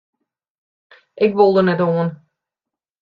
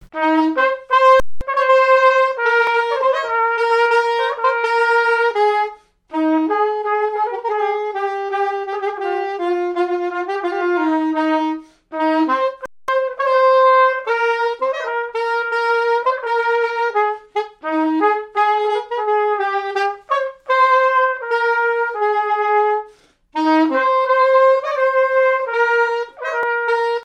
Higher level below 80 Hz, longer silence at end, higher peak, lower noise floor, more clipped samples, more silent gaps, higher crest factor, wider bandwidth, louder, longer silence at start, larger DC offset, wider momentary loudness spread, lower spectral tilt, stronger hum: second, -62 dBFS vs -50 dBFS; first, 0.85 s vs 0 s; about the same, -2 dBFS vs -2 dBFS; first, -86 dBFS vs -48 dBFS; neither; neither; about the same, 18 dB vs 16 dB; second, 5.2 kHz vs 9.8 kHz; about the same, -16 LUFS vs -17 LUFS; first, 1.15 s vs 0.15 s; neither; about the same, 8 LU vs 9 LU; first, -9.5 dB/octave vs -4 dB/octave; neither